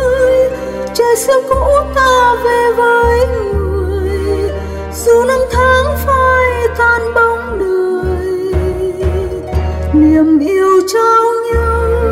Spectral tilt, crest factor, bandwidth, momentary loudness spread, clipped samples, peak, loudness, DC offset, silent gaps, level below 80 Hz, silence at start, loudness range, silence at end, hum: -5.5 dB/octave; 10 dB; 16 kHz; 7 LU; under 0.1%; 0 dBFS; -12 LUFS; under 0.1%; none; -22 dBFS; 0 s; 3 LU; 0 s; none